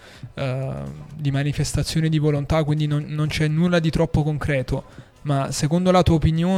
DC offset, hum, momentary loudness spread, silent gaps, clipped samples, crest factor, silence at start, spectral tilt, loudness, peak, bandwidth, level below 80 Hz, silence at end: under 0.1%; none; 11 LU; none; under 0.1%; 16 dB; 0.05 s; -6.5 dB/octave; -21 LUFS; -4 dBFS; 13.5 kHz; -38 dBFS; 0 s